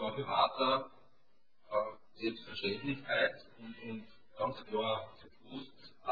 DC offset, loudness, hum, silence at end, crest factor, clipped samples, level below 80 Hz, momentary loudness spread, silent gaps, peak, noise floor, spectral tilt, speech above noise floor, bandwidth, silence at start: 0.1%; -36 LUFS; none; 0 s; 20 dB; under 0.1%; -72 dBFS; 19 LU; none; -18 dBFS; -77 dBFS; -2 dB/octave; 40 dB; 5 kHz; 0 s